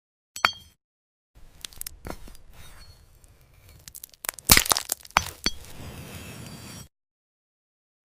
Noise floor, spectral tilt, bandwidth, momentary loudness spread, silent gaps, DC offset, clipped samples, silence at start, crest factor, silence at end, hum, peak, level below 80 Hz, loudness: -55 dBFS; -1 dB/octave; 16 kHz; 25 LU; 0.84-1.34 s; under 0.1%; under 0.1%; 0.35 s; 30 dB; 1.2 s; none; 0 dBFS; -46 dBFS; -23 LUFS